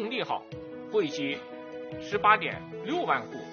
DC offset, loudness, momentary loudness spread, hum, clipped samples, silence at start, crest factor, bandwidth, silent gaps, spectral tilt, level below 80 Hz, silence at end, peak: under 0.1%; -29 LUFS; 18 LU; none; under 0.1%; 0 s; 24 dB; 6.6 kHz; none; -2.5 dB/octave; -66 dBFS; 0 s; -6 dBFS